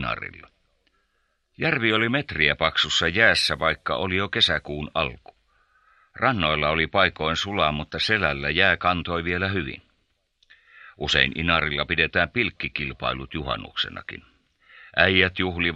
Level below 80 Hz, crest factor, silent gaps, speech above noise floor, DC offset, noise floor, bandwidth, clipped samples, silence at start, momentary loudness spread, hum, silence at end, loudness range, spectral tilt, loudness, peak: -46 dBFS; 24 dB; none; 47 dB; under 0.1%; -71 dBFS; 12.5 kHz; under 0.1%; 0 s; 10 LU; none; 0 s; 4 LU; -4 dB/octave; -22 LUFS; -2 dBFS